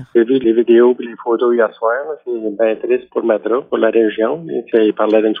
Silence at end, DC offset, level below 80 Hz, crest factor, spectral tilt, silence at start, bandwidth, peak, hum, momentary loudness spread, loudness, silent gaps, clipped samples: 0 s; under 0.1%; -64 dBFS; 14 dB; -8.5 dB/octave; 0 s; 3.8 kHz; 0 dBFS; none; 10 LU; -15 LUFS; none; under 0.1%